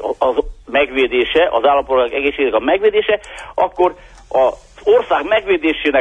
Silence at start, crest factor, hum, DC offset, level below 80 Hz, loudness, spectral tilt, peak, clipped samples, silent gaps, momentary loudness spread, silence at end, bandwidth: 0 s; 14 dB; none; under 0.1%; -40 dBFS; -16 LUFS; -4.5 dB/octave; -2 dBFS; under 0.1%; none; 6 LU; 0 s; 9.6 kHz